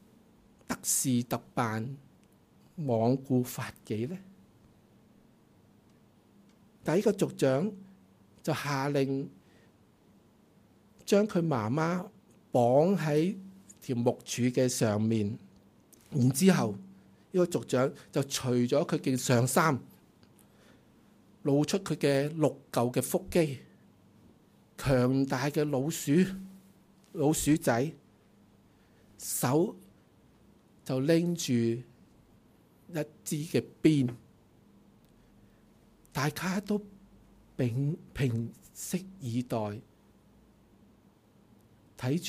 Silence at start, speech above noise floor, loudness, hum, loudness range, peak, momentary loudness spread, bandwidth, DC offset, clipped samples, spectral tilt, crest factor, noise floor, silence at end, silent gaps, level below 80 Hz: 0.7 s; 33 dB; -30 LUFS; none; 7 LU; -10 dBFS; 13 LU; 15.5 kHz; under 0.1%; under 0.1%; -5.5 dB/octave; 20 dB; -62 dBFS; 0 s; none; -62 dBFS